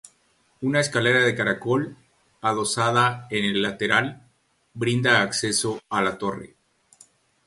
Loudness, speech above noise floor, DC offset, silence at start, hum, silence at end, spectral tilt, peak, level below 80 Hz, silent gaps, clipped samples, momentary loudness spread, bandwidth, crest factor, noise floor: -22 LUFS; 42 dB; under 0.1%; 0.6 s; none; 1 s; -4 dB/octave; -4 dBFS; -60 dBFS; none; under 0.1%; 10 LU; 11.5 kHz; 22 dB; -64 dBFS